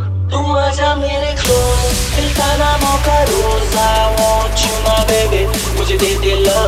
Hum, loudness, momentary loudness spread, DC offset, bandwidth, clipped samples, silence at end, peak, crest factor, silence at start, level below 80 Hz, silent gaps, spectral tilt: none; -14 LUFS; 3 LU; under 0.1%; 16.5 kHz; under 0.1%; 0 s; 0 dBFS; 12 dB; 0 s; -18 dBFS; none; -4 dB/octave